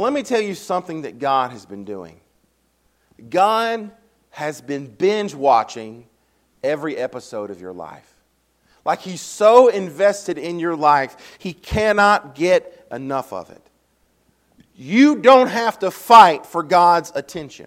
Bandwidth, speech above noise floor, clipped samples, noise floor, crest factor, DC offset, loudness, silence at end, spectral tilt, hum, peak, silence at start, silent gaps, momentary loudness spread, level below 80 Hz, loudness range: 16.5 kHz; 46 dB; 0.1%; -64 dBFS; 18 dB; under 0.1%; -17 LUFS; 0.05 s; -4.5 dB/octave; none; 0 dBFS; 0 s; none; 21 LU; -50 dBFS; 10 LU